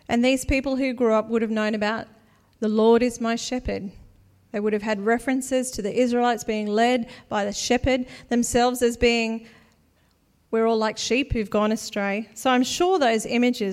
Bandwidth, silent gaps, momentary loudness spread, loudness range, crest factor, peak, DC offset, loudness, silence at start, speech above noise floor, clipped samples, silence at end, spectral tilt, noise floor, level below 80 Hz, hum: 15.5 kHz; none; 7 LU; 2 LU; 16 dB; -6 dBFS; under 0.1%; -23 LUFS; 0.1 s; 40 dB; under 0.1%; 0 s; -4 dB/octave; -63 dBFS; -42 dBFS; none